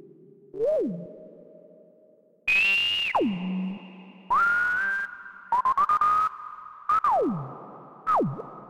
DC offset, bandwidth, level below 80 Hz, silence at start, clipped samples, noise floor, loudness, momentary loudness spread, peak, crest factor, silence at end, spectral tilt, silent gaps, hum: under 0.1%; 17 kHz; -62 dBFS; 0.55 s; under 0.1%; -59 dBFS; -24 LUFS; 20 LU; -14 dBFS; 14 dB; 0 s; -5 dB/octave; none; none